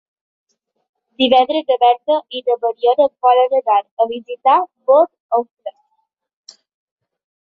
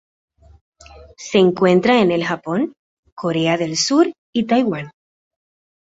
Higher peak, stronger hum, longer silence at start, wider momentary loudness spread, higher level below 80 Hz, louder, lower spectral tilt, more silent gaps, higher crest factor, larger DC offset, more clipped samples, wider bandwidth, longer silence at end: about the same, -2 dBFS vs -2 dBFS; neither; first, 1.2 s vs 0.95 s; second, 7 LU vs 13 LU; second, -68 dBFS vs -56 dBFS; about the same, -16 LUFS vs -17 LUFS; about the same, -4 dB/octave vs -5 dB/octave; second, 3.91-3.97 s, 5.20-5.29 s, 5.51-5.57 s vs 2.79-3.03 s, 3.12-3.17 s, 4.18-4.33 s; about the same, 16 dB vs 18 dB; neither; neither; second, 6.2 kHz vs 8 kHz; first, 1.7 s vs 1.05 s